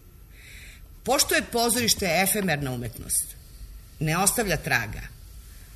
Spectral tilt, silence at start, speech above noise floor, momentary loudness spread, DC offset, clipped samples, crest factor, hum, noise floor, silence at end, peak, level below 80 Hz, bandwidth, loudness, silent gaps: -2.5 dB/octave; 0.05 s; 23 dB; 21 LU; under 0.1%; under 0.1%; 22 dB; none; -48 dBFS; 0 s; -6 dBFS; -44 dBFS; 14 kHz; -24 LUFS; none